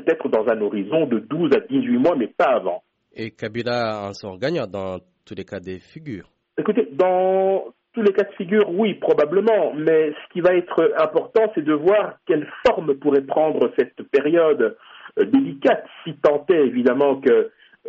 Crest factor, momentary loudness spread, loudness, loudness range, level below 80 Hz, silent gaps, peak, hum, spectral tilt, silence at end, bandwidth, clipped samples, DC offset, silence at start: 14 dB; 15 LU; -20 LUFS; 7 LU; -62 dBFS; none; -4 dBFS; none; -5 dB/octave; 0 s; 7.4 kHz; under 0.1%; under 0.1%; 0 s